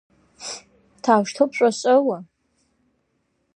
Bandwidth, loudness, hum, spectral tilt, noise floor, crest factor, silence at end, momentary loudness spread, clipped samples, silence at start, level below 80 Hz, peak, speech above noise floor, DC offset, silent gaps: 11 kHz; -20 LUFS; none; -4.5 dB/octave; -70 dBFS; 20 dB; 1.35 s; 16 LU; under 0.1%; 0.4 s; -72 dBFS; -2 dBFS; 52 dB; under 0.1%; none